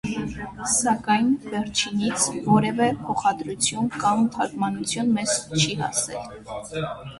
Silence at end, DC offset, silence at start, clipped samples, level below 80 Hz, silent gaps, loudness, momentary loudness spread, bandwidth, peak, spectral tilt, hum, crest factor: 0 s; under 0.1%; 0.05 s; under 0.1%; -52 dBFS; none; -23 LUFS; 10 LU; 11.5 kHz; -6 dBFS; -3.5 dB/octave; none; 18 dB